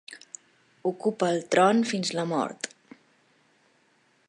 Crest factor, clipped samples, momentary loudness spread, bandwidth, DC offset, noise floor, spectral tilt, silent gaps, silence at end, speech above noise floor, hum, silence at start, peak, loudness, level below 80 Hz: 22 dB; under 0.1%; 22 LU; 11 kHz; under 0.1%; -66 dBFS; -4.5 dB/octave; none; 1.6 s; 41 dB; none; 0.1 s; -8 dBFS; -26 LUFS; -80 dBFS